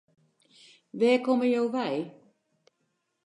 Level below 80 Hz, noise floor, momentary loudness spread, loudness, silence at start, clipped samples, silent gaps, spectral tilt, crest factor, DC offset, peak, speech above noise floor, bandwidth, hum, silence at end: -86 dBFS; -77 dBFS; 15 LU; -26 LUFS; 0.95 s; under 0.1%; none; -6 dB/octave; 18 dB; under 0.1%; -10 dBFS; 52 dB; 10.5 kHz; none; 1.15 s